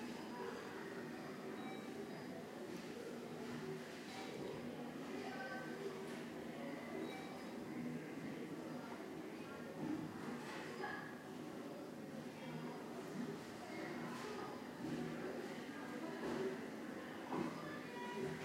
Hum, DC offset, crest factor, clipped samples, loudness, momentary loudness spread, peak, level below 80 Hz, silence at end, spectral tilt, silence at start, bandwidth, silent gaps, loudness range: none; under 0.1%; 18 dB; under 0.1%; -48 LUFS; 5 LU; -30 dBFS; -80 dBFS; 0 s; -5.5 dB/octave; 0 s; 16 kHz; none; 3 LU